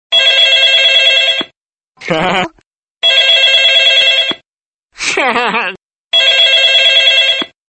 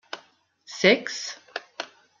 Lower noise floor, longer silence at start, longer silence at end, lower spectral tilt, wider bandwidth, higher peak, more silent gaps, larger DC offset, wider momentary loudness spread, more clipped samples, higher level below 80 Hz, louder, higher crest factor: first, under -90 dBFS vs -59 dBFS; about the same, 0.1 s vs 0.15 s; about the same, 0.25 s vs 0.35 s; second, -1 dB/octave vs -3.5 dB/octave; first, 10 kHz vs 7.6 kHz; first, 0 dBFS vs -4 dBFS; first, 1.57-1.66 s, 1.87-1.93 s, 2.66-2.95 s, 4.48-4.58 s, 4.65-4.89 s, 5.82-5.90 s, 5.98-6.10 s vs none; neither; second, 12 LU vs 21 LU; neither; first, -54 dBFS vs -76 dBFS; first, -7 LUFS vs -23 LUFS; second, 12 dB vs 24 dB